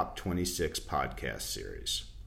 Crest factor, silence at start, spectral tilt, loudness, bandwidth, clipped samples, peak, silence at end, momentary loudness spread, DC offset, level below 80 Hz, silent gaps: 18 dB; 0 s; -3.5 dB/octave; -34 LUFS; 16 kHz; under 0.1%; -16 dBFS; 0 s; 5 LU; under 0.1%; -46 dBFS; none